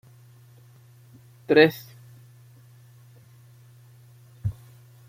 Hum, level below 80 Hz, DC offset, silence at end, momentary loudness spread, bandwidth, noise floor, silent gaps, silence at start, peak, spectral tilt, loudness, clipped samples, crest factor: none; -60 dBFS; under 0.1%; 0.55 s; 30 LU; 16 kHz; -52 dBFS; none; 1.5 s; -2 dBFS; -6.5 dB/octave; -22 LUFS; under 0.1%; 26 dB